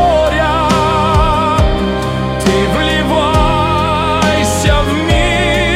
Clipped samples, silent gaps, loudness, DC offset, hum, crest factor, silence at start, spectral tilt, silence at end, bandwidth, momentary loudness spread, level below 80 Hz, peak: under 0.1%; none; -12 LUFS; under 0.1%; none; 12 dB; 0 s; -5 dB/octave; 0 s; 16 kHz; 2 LU; -20 dBFS; 0 dBFS